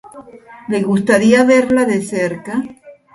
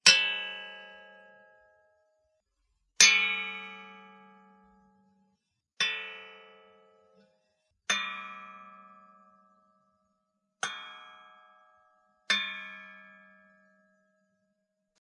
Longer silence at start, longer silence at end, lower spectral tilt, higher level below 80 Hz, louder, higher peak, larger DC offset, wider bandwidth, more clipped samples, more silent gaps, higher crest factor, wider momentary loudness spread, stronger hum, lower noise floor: about the same, 0.15 s vs 0.05 s; second, 0.2 s vs 2.05 s; first, -5.5 dB/octave vs 2 dB/octave; first, -54 dBFS vs -86 dBFS; first, -14 LUFS vs -27 LUFS; first, 0 dBFS vs -4 dBFS; neither; about the same, 11.5 kHz vs 11 kHz; neither; neither; second, 16 dB vs 30 dB; second, 13 LU vs 29 LU; neither; second, -38 dBFS vs -80 dBFS